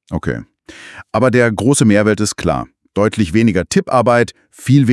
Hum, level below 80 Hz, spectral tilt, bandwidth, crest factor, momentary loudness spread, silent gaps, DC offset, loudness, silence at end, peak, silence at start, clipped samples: none; -42 dBFS; -6 dB/octave; 12 kHz; 14 dB; 12 LU; none; under 0.1%; -14 LUFS; 0 s; 0 dBFS; 0.1 s; under 0.1%